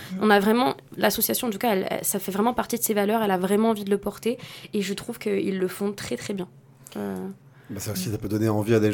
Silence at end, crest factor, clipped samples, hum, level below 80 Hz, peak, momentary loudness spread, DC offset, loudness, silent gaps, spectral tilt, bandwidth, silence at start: 0 s; 20 dB; under 0.1%; none; -58 dBFS; -4 dBFS; 12 LU; under 0.1%; -25 LUFS; none; -4.5 dB/octave; 19 kHz; 0 s